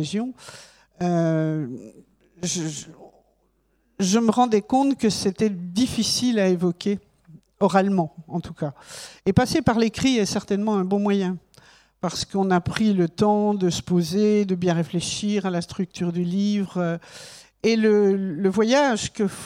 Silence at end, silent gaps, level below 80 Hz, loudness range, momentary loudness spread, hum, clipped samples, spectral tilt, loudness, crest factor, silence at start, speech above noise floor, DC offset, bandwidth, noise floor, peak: 0 s; none; -52 dBFS; 4 LU; 12 LU; none; under 0.1%; -5.5 dB/octave; -22 LUFS; 20 dB; 0 s; 44 dB; under 0.1%; 15 kHz; -66 dBFS; -4 dBFS